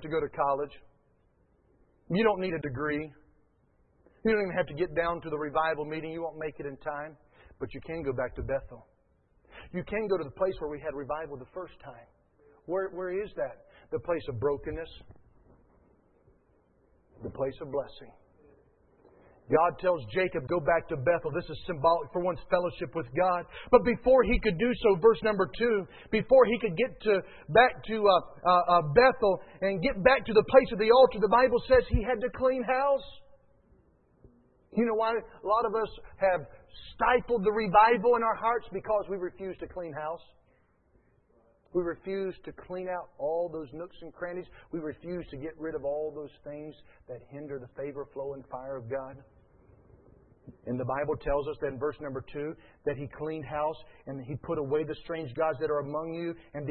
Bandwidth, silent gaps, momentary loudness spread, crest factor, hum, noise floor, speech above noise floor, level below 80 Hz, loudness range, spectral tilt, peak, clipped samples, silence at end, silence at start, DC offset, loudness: 4.4 kHz; none; 18 LU; 24 dB; none; -68 dBFS; 39 dB; -50 dBFS; 14 LU; -10 dB/octave; -6 dBFS; under 0.1%; 0 s; 0 s; under 0.1%; -29 LUFS